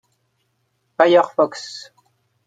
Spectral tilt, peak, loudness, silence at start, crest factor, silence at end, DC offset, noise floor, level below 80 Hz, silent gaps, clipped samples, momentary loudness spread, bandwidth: -4.5 dB/octave; 0 dBFS; -16 LUFS; 1 s; 20 dB; 0.65 s; under 0.1%; -69 dBFS; -72 dBFS; none; under 0.1%; 22 LU; 9.2 kHz